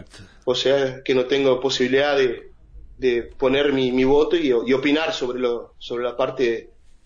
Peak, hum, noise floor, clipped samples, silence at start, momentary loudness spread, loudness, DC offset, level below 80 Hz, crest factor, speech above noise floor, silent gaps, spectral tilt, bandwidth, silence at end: -8 dBFS; none; -43 dBFS; under 0.1%; 0 s; 9 LU; -21 LUFS; under 0.1%; -44 dBFS; 14 dB; 23 dB; none; -4.5 dB/octave; 7.6 kHz; 0.4 s